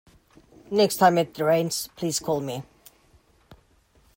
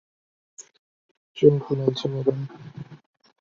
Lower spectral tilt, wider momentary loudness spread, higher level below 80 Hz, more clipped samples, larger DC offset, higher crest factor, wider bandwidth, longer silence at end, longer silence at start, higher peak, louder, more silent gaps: second, -4.5 dB/octave vs -7.5 dB/octave; second, 9 LU vs 23 LU; about the same, -62 dBFS vs -64 dBFS; neither; neither; about the same, 20 dB vs 24 dB; first, 16.5 kHz vs 7.6 kHz; first, 0.6 s vs 0.45 s; about the same, 0.7 s vs 0.6 s; second, -6 dBFS vs -2 dBFS; about the same, -24 LUFS vs -23 LUFS; second, none vs 0.79-1.35 s